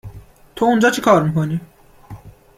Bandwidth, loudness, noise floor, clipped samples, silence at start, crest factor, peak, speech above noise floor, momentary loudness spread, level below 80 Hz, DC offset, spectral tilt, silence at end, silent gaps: 16 kHz; -16 LUFS; -40 dBFS; under 0.1%; 0.05 s; 18 dB; -2 dBFS; 24 dB; 9 LU; -48 dBFS; under 0.1%; -6 dB/octave; 0.3 s; none